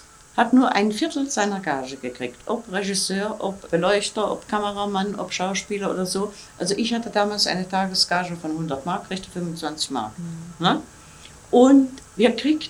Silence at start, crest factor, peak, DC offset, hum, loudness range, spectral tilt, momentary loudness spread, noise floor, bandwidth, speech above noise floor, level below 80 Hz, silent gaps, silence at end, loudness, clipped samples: 0.35 s; 20 dB; -4 dBFS; under 0.1%; none; 3 LU; -4 dB/octave; 12 LU; -45 dBFS; 13 kHz; 22 dB; -56 dBFS; none; 0 s; -23 LUFS; under 0.1%